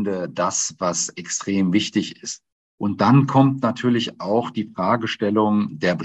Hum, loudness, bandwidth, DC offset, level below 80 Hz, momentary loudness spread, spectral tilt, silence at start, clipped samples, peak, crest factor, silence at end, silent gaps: none; -21 LUFS; 8.6 kHz; under 0.1%; -64 dBFS; 11 LU; -5 dB/octave; 0 s; under 0.1%; -2 dBFS; 18 dB; 0 s; 2.52-2.78 s